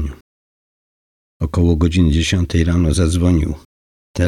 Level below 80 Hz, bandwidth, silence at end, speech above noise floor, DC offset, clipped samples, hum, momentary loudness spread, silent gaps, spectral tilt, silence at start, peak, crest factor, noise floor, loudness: -28 dBFS; 12 kHz; 0 s; over 76 dB; under 0.1%; under 0.1%; none; 13 LU; 0.21-1.40 s, 3.65-4.14 s; -6.5 dB/octave; 0 s; -4 dBFS; 12 dB; under -90 dBFS; -16 LUFS